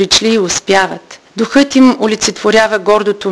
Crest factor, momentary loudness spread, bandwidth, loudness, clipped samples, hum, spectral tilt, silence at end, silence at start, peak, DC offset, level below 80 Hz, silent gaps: 12 dB; 9 LU; 11 kHz; -11 LUFS; 0.2%; none; -3 dB/octave; 0 s; 0 s; 0 dBFS; under 0.1%; -44 dBFS; none